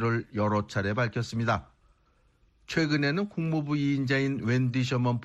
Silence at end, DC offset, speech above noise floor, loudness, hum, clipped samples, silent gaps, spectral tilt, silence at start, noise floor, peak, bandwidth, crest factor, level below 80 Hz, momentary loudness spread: 0 s; under 0.1%; 39 dB; -28 LUFS; none; under 0.1%; none; -6.5 dB/octave; 0 s; -66 dBFS; -14 dBFS; 8.4 kHz; 16 dB; -58 dBFS; 4 LU